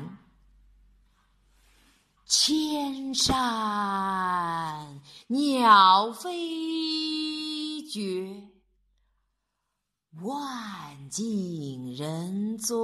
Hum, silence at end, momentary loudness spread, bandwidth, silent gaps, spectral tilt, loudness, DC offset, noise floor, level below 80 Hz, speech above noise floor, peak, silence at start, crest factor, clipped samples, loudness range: none; 0 s; 17 LU; 13 kHz; none; -3 dB/octave; -26 LUFS; under 0.1%; -82 dBFS; -56 dBFS; 57 dB; -4 dBFS; 0 s; 24 dB; under 0.1%; 13 LU